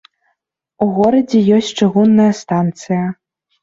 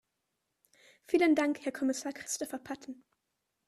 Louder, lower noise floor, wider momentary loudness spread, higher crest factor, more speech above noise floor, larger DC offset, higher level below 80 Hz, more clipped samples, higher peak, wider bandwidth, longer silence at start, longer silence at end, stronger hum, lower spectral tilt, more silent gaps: first, -14 LUFS vs -32 LUFS; second, -70 dBFS vs -84 dBFS; second, 8 LU vs 17 LU; second, 12 dB vs 20 dB; first, 57 dB vs 52 dB; neither; first, -56 dBFS vs -76 dBFS; neither; first, -2 dBFS vs -14 dBFS; second, 7.8 kHz vs 13.5 kHz; second, 0.8 s vs 1.1 s; second, 0.5 s vs 0.75 s; neither; first, -7 dB/octave vs -2.5 dB/octave; neither